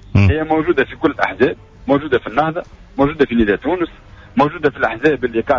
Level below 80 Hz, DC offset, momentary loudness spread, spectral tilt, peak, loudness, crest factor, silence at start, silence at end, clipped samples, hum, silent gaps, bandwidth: -34 dBFS; under 0.1%; 7 LU; -8.5 dB/octave; -2 dBFS; -17 LUFS; 14 dB; 0.15 s; 0 s; under 0.1%; none; none; 7.4 kHz